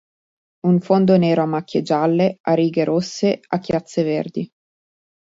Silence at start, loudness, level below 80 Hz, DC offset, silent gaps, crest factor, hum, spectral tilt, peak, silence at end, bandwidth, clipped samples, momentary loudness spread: 0.65 s; -19 LUFS; -60 dBFS; under 0.1%; 2.40-2.44 s; 18 dB; none; -7.5 dB/octave; -2 dBFS; 0.95 s; 7.8 kHz; under 0.1%; 9 LU